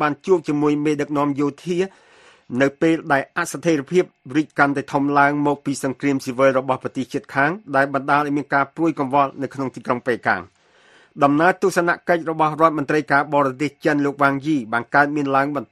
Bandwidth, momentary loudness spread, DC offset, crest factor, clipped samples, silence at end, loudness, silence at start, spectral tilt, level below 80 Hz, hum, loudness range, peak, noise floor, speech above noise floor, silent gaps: 13 kHz; 7 LU; under 0.1%; 20 dB; under 0.1%; 0.1 s; -20 LUFS; 0 s; -6 dB/octave; -62 dBFS; none; 3 LU; 0 dBFS; -53 dBFS; 34 dB; none